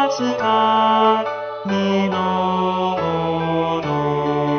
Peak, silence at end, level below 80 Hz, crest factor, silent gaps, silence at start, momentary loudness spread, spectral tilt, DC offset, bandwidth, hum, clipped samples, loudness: -4 dBFS; 0 s; -52 dBFS; 16 dB; none; 0 s; 6 LU; -6 dB/octave; under 0.1%; 6.6 kHz; none; under 0.1%; -19 LUFS